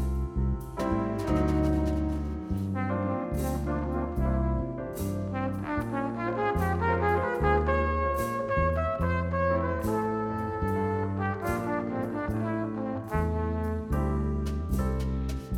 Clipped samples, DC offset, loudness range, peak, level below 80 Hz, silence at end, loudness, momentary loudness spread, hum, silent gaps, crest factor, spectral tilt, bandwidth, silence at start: under 0.1%; under 0.1%; 3 LU; -12 dBFS; -36 dBFS; 0 s; -29 LUFS; 6 LU; none; none; 16 dB; -8 dB/octave; 17 kHz; 0 s